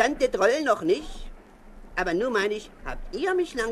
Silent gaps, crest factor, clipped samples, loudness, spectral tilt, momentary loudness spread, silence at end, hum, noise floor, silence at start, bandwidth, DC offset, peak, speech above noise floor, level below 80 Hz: none; 20 dB; under 0.1%; -26 LUFS; -4 dB/octave; 16 LU; 0 s; none; -46 dBFS; 0 s; 13.5 kHz; under 0.1%; -6 dBFS; 21 dB; -42 dBFS